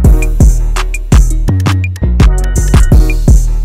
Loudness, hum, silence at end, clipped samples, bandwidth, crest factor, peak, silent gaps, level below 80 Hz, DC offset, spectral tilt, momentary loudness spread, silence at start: -11 LUFS; none; 0 s; 3%; 15 kHz; 6 dB; 0 dBFS; none; -8 dBFS; under 0.1%; -6 dB/octave; 5 LU; 0 s